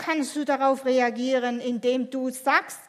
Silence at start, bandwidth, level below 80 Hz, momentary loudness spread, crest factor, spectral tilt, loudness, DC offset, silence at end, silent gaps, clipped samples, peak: 0 s; 15 kHz; -82 dBFS; 5 LU; 18 dB; -3 dB/octave; -25 LUFS; under 0.1%; 0.05 s; none; under 0.1%; -6 dBFS